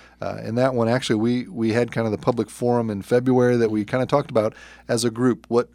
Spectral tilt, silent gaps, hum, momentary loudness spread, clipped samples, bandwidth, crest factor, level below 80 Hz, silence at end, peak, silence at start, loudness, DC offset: -6 dB/octave; none; none; 7 LU; under 0.1%; 15 kHz; 18 dB; -56 dBFS; 0.1 s; -4 dBFS; 0.2 s; -22 LUFS; under 0.1%